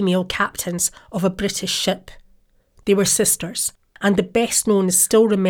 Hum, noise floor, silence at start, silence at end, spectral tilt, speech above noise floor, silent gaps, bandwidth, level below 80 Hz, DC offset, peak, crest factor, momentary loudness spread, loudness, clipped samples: none; -56 dBFS; 0 s; 0 s; -3.5 dB/octave; 37 dB; none; 20 kHz; -48 dBFS; under 0.1%; -4 dBFS; 16 dB; 8 LU; -19 LUFS; under 0.1%